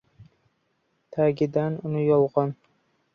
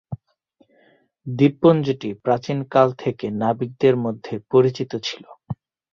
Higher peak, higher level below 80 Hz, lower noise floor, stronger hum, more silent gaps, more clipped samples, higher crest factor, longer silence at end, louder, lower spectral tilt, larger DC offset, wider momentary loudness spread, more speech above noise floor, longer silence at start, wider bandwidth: second, -8 dBFS vs -2 dBFS; second, -66 dBFS vs -58 dBFS; first, -72 dBFS vs -61 dBFS; neither; neither; neither; about the same, 18 dB vs 18 dB; first, 0.6 s vs 0.4 s; second, -24 LUFS vs -20 LUFS; first, -10 dB/octave vs -7.5 dB/octave; neither; second, 11 LU vs 19 LU; first, 49 dB vs 42 dB; about the same, 0.2 s vs 0.1 s; second, 6.4 kHz vs 7.2 kHz